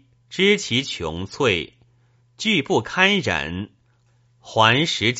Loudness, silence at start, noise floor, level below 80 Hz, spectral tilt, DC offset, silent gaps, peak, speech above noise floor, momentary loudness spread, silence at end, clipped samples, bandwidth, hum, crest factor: -20 LUFS; 0.3 s; -60 dBFS; -52 dBFS; -2.5 dB/octave; under 0.1%; none; 0 dBFS; 40 dB; 14 LU; 0 s; under 0.1%; 8 kHz; none; 22 dB